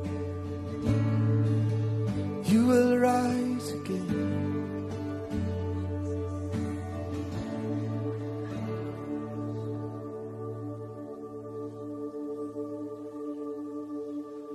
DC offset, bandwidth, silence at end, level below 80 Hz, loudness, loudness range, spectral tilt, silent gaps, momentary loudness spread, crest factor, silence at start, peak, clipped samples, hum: under 0.1%; 13 kHz; 0 s; -56 dBFS; -31 LUFS; 12 LU; -7.5 dB/octave; none; 14 LU; 18 dB; 0 s; -12 dBFS; under 0.1%; none